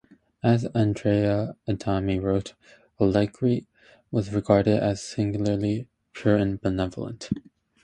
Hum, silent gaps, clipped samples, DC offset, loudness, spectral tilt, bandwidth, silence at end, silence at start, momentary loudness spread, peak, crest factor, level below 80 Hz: none; none; under 0.1%; under 0.1%; -25 LUFS; -7.5 dB/octave; 9.6 kHz; 0.45 s; 0.45 s; 9 LU; -4 dBFS; 20 dB; -48 dBFS